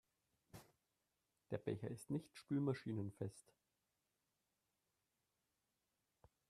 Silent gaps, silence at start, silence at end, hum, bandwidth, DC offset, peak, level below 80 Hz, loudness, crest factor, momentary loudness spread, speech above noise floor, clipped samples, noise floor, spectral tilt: none; 0.55 s; 3.1 s; none; 13.5 kHz; under 0.1%; -28 dBFS; -82 dBFS; -46 LUFS; 22 dB; 22 LU; 44 dB; under 0.1%; -89 dBFS; -7.5 dB/octave